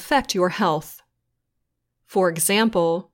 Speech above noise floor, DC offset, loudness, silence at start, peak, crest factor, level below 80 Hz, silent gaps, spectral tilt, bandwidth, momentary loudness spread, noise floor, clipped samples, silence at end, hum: 56 dB; under 0.1%; -21 LUFS; 0 s; -8 dBFS; 16 dB; -56 dBFS; none; -3.5 dB/octave; 17 kHz; 9 LU; -76 dBFS; under 0.1%; 0.1 s; none